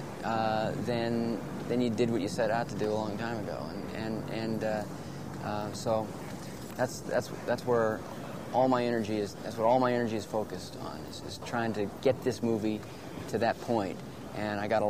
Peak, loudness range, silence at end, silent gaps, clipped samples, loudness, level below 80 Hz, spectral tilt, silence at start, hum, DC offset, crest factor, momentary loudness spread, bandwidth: -12 dBFS; 5 LU; 0 s; none; under 0.1%; -32 LUFS; -60 dBFS; -6 dB/octave; 0 s; none; 0.2%; 18 dB; 12 LU; 15.5 kHz